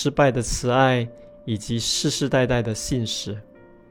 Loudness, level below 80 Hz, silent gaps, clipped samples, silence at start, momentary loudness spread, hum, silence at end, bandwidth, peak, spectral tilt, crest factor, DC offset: -22 LUFS; -40 dBFS; none; under 0.1%; 0 s; 14 LU; none; 0.5 s; 17.5 kHz; -4 dBFS; -4.5 dB/octave; 18 dB; under 0.1%